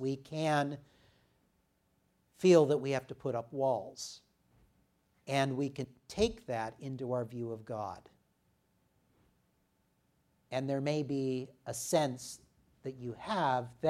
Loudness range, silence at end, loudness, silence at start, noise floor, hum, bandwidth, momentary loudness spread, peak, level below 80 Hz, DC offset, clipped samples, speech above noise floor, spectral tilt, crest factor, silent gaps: 10 LU; 0 s; -34 LUFS; 0 s; -75 dBFS; none; 15.5 kHz; 13 LU; -12 dBFS; -66 dBFS; under 0.1%; under 0.1%; 42 dB; -5.5 dB/octave; 24 dB; none